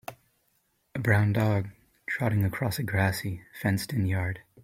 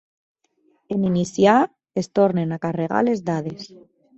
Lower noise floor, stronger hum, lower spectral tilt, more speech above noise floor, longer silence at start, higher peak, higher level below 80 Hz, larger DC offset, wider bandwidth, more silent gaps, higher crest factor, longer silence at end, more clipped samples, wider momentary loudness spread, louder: first, -72 dBFS vs -64 dBFS; neither; about the same, -6.5 dB/octave vs -6.5 dB/octave; about the same, 45 dB vs 44 dB; second, 0.1 s vs 0.9 s; second, -8 dBFS vs -4 dBFS; about the same, -56 dBFS vs -60 dBFS; neither; first, 16 kHz vs 8.2 kHz; neither; about the same, 20 dB vs 18 dB; second, 0.25 s vs 0.5 s; neither; about the same, 13 LU vs 12 LU; second, -28 LUFS vs -21 LUFS